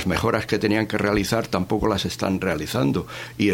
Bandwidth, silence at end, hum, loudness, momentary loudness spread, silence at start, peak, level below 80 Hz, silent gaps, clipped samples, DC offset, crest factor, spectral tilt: 17.5 kHz; 0 s; none; -23 LUFS; 3 LU; 0 s; -4 dBFS; -42 dBFS; none; under 0.1%; under 0.1%; 18 dB; -5.5 dB/octave